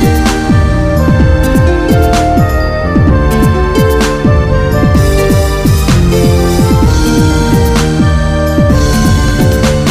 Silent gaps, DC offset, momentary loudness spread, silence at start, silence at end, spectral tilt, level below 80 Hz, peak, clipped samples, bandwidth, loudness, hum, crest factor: none; 1%; 2 LU; 0 s; 0 s; -6.5 dB/octave; -14 dBFS; 0 dBFS; under 0.1%; 15.5 kHz; -9 LUFS; none; 8 dB